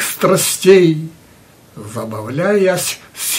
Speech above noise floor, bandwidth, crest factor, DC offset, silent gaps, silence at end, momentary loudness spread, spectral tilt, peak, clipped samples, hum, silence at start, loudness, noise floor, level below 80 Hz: 31 dB; 16.5 kHz; 16 dB; under 0.1%; none; 0 s; 18 LU; -4 dB/octave; 0 dBFS; under 0.1%; none; 0 s; -14 LUFS; -45 dBFS; -58 dBFS